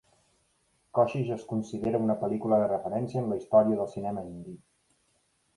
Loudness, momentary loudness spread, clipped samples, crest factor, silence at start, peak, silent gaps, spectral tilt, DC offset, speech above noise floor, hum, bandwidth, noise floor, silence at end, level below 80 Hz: -28 LUFS; 12 LU; under 0.1%; 20 dB; 0.95 s; -10 dBFS; none; -8.5 dB/octave; under 0.1%; 43 dB; none; 11.5 kHz; -71 dBFS; 1 s; -64 dBFS